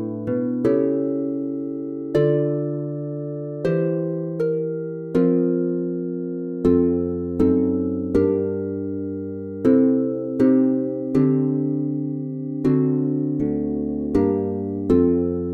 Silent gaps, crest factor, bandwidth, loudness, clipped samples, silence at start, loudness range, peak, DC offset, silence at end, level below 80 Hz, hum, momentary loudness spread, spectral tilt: none; 16 dB; 4.6 kHz; -22 LUFS; under 0.1%; 0 s; 3 LU; -4 dBFS; under 0.1%; 0 s; -48 dBFS; none; 10 LU; -10.5 dB/octave